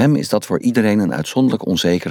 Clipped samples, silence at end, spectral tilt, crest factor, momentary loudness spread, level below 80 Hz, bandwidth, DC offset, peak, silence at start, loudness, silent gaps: under 0.1%; 0 s; -6 dB/octave; 12 dB; 3 LU; -52 dBFS; 17.5 kHz; under 0.1%; -4 dBFS; 0 s; -17 LUFS; none